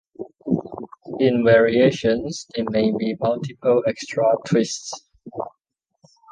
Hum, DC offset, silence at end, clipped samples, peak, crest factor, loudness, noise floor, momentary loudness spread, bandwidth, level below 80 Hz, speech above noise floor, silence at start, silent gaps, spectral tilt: none; under 0.1%; 0.85 s; under 0.1%; -4 dBFS; 18 dB; -20 LUFS; -76 dBFS; 20 LU; 9.8 kHz; -56 dBFS; 57 dB; 0.2 s; none; -5.5 dB/octave